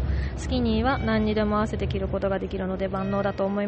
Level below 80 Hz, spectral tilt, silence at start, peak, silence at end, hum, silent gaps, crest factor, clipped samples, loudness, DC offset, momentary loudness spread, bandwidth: -34 dBFS; -7 dB/octave; 0 s; -10 dBFS; 0 s; none; none; 14 dB; under 0.1%; -26 LUFS; under 0.1%; 5 LU; 8.4 kHz